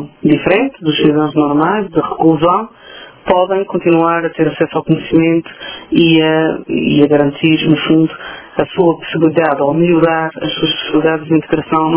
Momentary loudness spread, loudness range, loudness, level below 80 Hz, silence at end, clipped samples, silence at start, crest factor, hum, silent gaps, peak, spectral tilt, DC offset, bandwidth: 7 LU; 2 LU; -13 LUFS; -46 dBFS; 0 s; 0.2%; 0 s; 12 dB; none; none; 0 dBFS; -10.5 dB/octave; under 0.1%; 4 kHz